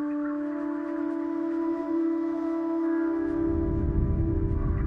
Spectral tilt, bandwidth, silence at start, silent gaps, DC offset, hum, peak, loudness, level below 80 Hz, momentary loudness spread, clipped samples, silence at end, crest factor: -11 dB/octave; 3.7 kHz; 0 s; none; under 0.1%; none; -14 dBFS; -28 LUFS; -34 dBFS; 4 LU; under 0.1%; 0 s; 12 dB